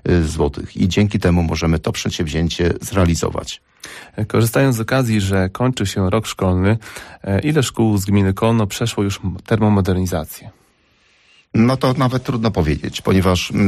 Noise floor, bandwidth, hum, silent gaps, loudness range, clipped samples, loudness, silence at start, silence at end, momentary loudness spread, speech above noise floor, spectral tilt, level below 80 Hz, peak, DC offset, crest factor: -57 dBFS; 15 kHz; none; none; 2 LU; under 0.1%; -18 LUFS; 0.05 s; 0 s; 9 LU; 40 dB; -6 dB/octave; -34 dBFS; -4 dBFS; under 0.1%; 12 dB